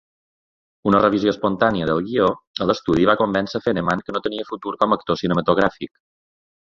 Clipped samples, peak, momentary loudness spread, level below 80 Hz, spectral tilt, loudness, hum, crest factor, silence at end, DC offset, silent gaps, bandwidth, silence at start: under 0.1%; -2 dBFS; 9 LU; -50 dBFS; -7 dB/octave; -20 LUFS; none; 18 dB; 0.75 s; under 0.1%; 2.47-2.54 s; 7.6 kHz; 0.85 s